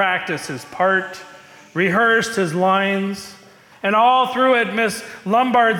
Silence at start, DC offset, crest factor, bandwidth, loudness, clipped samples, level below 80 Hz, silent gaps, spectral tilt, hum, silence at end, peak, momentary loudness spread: 0 s; under 0.1%; 12 dB; 17.5 kHz; -18 LUFS; under 0.1%; -64 dBFS; none; -4.5 dB/octave; none; 0 s; -6 dBFS; 14 LU